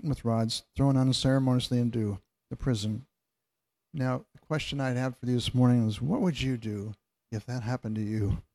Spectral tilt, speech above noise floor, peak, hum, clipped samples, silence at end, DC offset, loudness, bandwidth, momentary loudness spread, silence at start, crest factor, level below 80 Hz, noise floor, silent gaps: -6.5 dB/octave; 57 dB; -12 dBFS; none; under 0.1%; 0.15 s; under 0.1%; -29 LUFS; 12.5 kHz; 13 LU; 0.05 s; 16 dB; -50 dBFS; -86 dBFS; none